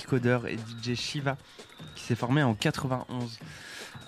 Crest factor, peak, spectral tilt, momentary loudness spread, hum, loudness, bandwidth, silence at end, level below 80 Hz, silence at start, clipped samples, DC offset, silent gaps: 20 dB; -10 dBFS; -5.5 dB/octave; 17 LU; none; -30 LUFS; 15 kHz; 0 s; -60 dBFS; 0 s; under 0.1%; under 0.1%; none